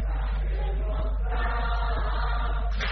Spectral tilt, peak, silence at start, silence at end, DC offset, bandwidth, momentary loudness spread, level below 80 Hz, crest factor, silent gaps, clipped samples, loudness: -4.5 dB/octave; -16 dBFS; 0 s; 0 s; under 0.1%; 5.6 kHz; 2 LU; -26 dBFS; 10 dB; none; under 0.1%; -29 LUFS